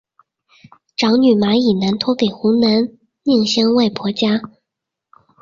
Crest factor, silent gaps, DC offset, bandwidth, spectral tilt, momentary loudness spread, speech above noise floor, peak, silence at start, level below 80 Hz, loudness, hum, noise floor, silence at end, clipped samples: 14 dB; none; under 0.1%; 7.4 kHz; -5.5 dB/octave; 7 LU; 67 dB; -2 dBFS; 1 s; -56 dBFS; -16 LUFS; none; -81 dBFS; 0.95 s; under 0.1%